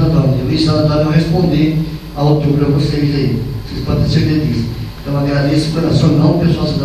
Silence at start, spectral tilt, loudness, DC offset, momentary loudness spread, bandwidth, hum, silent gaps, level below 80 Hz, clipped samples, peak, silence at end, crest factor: 0 s; -7.5 dB/octave; -14 LUFS; under 0.1%; 8 LU; 14 kHz; none; none; -28 dBFS; under 0.1%; 0 dBFS; 0 s; 12 dB